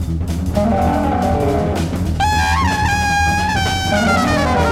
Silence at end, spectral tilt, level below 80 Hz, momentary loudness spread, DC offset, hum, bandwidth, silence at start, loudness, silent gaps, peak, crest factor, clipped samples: 0 s; -5 dB/octave; -26 dBFS; 5 LU; under 0.1%; none; 16.5 kHz; 0 s; -16 LUFS; none; -2 dBFS; 12 dB; under 0.1%